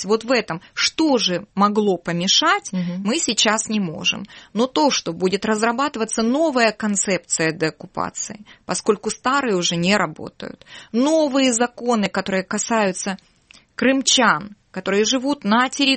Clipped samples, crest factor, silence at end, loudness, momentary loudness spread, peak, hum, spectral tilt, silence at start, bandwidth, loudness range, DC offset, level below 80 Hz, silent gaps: under 0.1%; 18 dB; 0 s; -19 LUFS; 12 LU; -2 dBFS; none; -3 dB/octave; 0 s; 8.8 kHz; 3 LU; under 0.1%; -58 dBFS; none